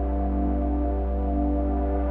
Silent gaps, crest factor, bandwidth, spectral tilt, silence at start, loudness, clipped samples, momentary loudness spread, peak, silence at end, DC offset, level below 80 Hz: none; 10 dB; 2.8 kHz; -12.5 dB/octave; 0 s; -26 LUFS; under 0.1%; 2 LU; -14 dBFS; 0 s; under 0.1%; -26 dBFS